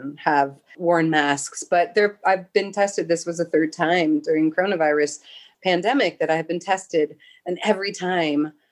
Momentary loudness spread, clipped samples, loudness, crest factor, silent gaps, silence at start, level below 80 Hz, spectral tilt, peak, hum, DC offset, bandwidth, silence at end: 6 LU; under 0.1%; -22 LUFS; 18 dB; none; 0 s; -76 dBFS; -4.5 dB/octave; -4 dBFS; none; under 0.1%; 12 kHz; 0.2 s